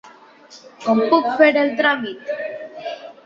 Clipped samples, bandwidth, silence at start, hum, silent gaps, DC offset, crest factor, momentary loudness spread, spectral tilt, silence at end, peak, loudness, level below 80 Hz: under 0.1%; 7.4 kHz; 0.05 s; none; none; under 0.1%; 18 dB; 17 LU; -5.5 dB/octave; 0.15 s; -2 dBFS; -18 LUFS; -68 dBFS